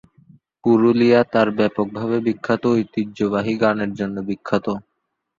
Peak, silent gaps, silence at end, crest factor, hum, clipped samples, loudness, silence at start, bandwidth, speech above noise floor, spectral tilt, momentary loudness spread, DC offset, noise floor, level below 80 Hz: -2 dBFS; none; 0.6 s; 18 dB; none; under 0.1%; -19 LUFS; 0.65 s; 7.4 kHz; 56 dB; -7.5 dB/octave; 10 LU; under 0.1%; -75 dBFS; -56 dBFS